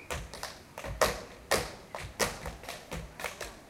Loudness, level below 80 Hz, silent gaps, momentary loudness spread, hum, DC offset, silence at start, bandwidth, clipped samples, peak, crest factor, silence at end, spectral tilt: -35 LUFS; -48 dBFS; none; 12 LU; none; under 0.1%; 0 s; 17 kHz; under 0.1%; -8 dBFS; 28 dB; 0 s; -2.5 dB/octave